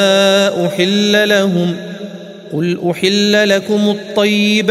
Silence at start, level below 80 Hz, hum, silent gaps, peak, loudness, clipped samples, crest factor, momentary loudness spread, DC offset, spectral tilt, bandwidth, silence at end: 0 s; -62 dBFS; none; none; 0 dBFS; -13 LUFS; under 0.1%; 14 dB; 14 LU; under 0.1%; -4.5 dB/octave; 15 kHz; 0 s